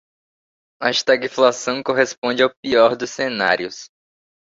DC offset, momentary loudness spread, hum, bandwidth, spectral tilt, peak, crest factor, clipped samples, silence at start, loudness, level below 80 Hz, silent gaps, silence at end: under 0.1%; 8 LU; none; 7.8 kHz; -3 dB/octave; -2 dBFS; 18 dB; under 0.1%; 0.8 s; -18 LUFS; -62 dBFS; 2.18-2.22 s, 2.57-2.63 s; 0.65 s